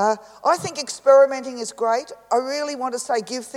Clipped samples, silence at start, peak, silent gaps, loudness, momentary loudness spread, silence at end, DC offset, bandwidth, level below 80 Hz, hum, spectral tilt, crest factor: under 0.1%; 0 s; -4 dBFS; none; -21 LUFS; 12 LU; 0 s; under 0.1%; 13 kHz; -72 dBFS; none; -3 dB/octave; 18 dB